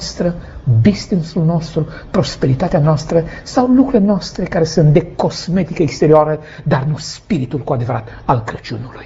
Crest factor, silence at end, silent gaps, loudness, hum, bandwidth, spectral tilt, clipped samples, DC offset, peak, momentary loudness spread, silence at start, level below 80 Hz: 14 dB; 0 s; none; -15 LUFS; none; 8 kHz; -7 dB/octave; under 0.1%; under 0.1%; 0 dBFS; 10 LU; 0 s; -36 dBFS